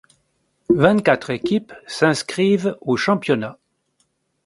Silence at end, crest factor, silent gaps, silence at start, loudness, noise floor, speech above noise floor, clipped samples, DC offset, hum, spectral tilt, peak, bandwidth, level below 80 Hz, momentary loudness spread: 0.95 s; 20 dB; none; 0.7 s; -19 LUFS; -67 dBFS; 49 dB; under 0.1%; under 0.1%; none; -5.5 dB/octave; 0 dBFS; 11.5 kHz; -56 dBFS; 8 LU